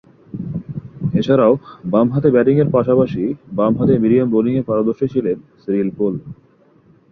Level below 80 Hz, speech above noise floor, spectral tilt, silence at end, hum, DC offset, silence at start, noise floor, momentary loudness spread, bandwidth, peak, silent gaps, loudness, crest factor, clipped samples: -50 dBFS; 36 dB; -10 dB/octave; 0.8 s; none; under 0.1%; 0.35 s; -51 dBFS; 13 LU; 6.2 kHz; -2 dBFS; none; -17 LUFS; 16 dB; under 0.1%